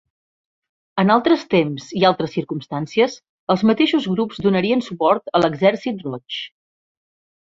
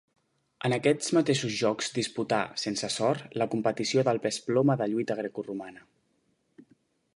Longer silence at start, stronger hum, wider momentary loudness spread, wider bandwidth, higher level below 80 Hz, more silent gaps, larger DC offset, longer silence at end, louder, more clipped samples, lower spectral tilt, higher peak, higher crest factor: first, 0.95 s vs 0.6 s; neither; first, 12 LU vs 8 LU; second, 7.6 kHz vs 11.5 kHz; first, -60 dBFS vs -72 dBFS; first, 3.29-3.47 s vs none; neither; first, 0.95 s vs 0.55 s; first, -19 LUFS vs -28 LUFS; neither; first, -6.5 dB/octave vs -4.5 dB/octave; first, -2 dBFS vs -10 dBFS; about the same, 18 dB vs 18 dB